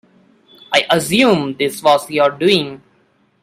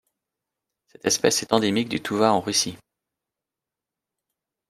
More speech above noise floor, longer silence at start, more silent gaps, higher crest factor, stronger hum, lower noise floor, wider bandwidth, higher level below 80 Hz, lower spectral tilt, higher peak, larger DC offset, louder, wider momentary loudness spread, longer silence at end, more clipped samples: second, 43 dB vs 65 dB; second, 0.7 s vs 1.05 s; neither; second, 16 dB vs 24 dB; neither; second, -57 dBFS vs -88 dBFS; about the same, 16 kHz vs 16 kHz; first, -56 dBFS vs -66 dBFS; about the same, -4 dB/octave vs -3 dB/octave; about the same, 0 dBFS vs -2 dBFS; neither; first, -15 LUFS vs -22 LUFS; about the same, 4 LU vs 6 LU; second, 0.65 s vs 1.95 s; neither